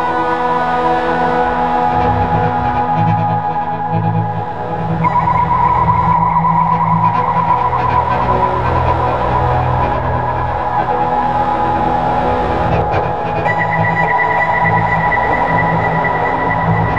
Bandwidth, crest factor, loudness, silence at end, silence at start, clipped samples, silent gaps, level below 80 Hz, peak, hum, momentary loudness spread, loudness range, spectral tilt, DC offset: 7.4 kHz; 12 dB; -14 LUFS; 0 s; 0 s; under 0.1%; none; -30 dBFS; -2 dBFS; none; 4 LU; 2 LU; -8 dB/octave; 3%